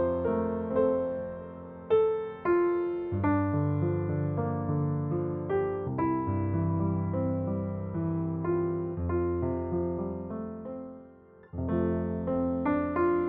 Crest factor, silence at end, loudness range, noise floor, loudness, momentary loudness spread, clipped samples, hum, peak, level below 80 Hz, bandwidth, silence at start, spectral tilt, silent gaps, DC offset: 14 dB; 0 s; 4 LU; -53 dBFS; -30 LUFS; 10 LU; under 0.1%; none; -16 dBFS; -52 dBFS; 3.8 kHz; 0 s; -10 dB/octave; none; under 0.1%